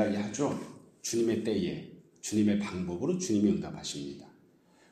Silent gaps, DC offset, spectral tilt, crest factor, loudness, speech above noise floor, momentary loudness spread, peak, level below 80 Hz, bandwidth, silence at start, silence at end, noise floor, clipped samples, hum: none; under 0.1%; -5.5 dB/octave; 18 dB; -31 LUFS; 32 dB; 15 LU; -14 dBFS; -64 dBFS; 15 kHz; 0 s; 0.65 s; -63 dBFS; under 0.1%; none